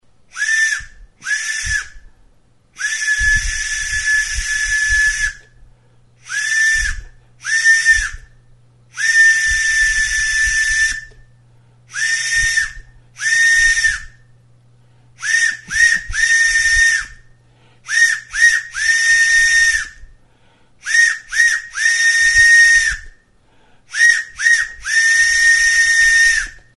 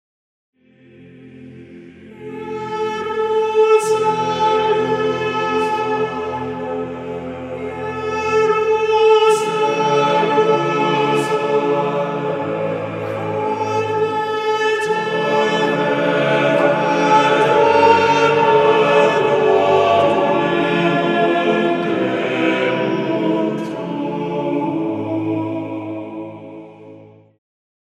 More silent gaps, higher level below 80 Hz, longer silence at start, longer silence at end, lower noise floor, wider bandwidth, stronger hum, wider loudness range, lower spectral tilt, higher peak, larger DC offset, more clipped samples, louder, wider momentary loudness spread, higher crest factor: neither; first, -34 dBFS vs -58 dBFS; second, 0.35 s vs 1 s; second, 0.2 s vs 0.8 s; first, -53 dBFS vs -47 dBFS; about the same, 11.5 kHz vs 12 kHz; neither; second, 5 LU vs 9 LU; second, 2.5 dB/octave vs -5.5 dB/octave; about the same, 0 dBFS vs 0 dBFS; first, 0.2% vs under 0.1%; neither; first, -13 LUFS vs -17 LUFS; about the same, 12 LU vs 12 LU; about the same, 16 dB vs 18 dB